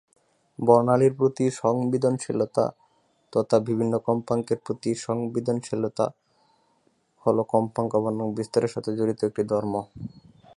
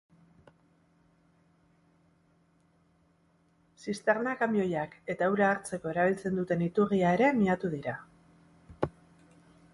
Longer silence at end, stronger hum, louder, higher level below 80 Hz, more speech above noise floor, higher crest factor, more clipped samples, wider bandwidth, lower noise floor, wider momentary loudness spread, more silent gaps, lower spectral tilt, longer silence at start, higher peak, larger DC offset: second, 0.5 s vs 0.85 s; neither; first, -25 LUFS vs -29 LUFS; about the same, -64 dBFS vs -64 dBFS; first, 43 dB vs 39 dB; about the same, 22 dB vs 20 dB; neither; about the same, 11.5 kHz vs 11.5 kHz; about the same, -67 dBFS vs -68 dBFS; second, 9 LU vs 12 LU; neither; about the same, -7 dB/octave vs -7 dB/octave; second, 0.6 s vs 3.8 s; first, -4 dBFS vs -12 dBFS; neither